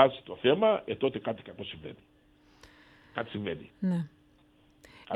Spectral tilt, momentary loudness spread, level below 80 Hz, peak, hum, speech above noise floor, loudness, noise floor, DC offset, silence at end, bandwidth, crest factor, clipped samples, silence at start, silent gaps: -7.5 dB/octave; 16 LU; -66 dBFS; -4 dBFS; none; 33 dB; -31 LUFS; -63 dBFS; under 0.1%; 0 s; 11 kHz; 26 dB; under 0.1%; 0 s; none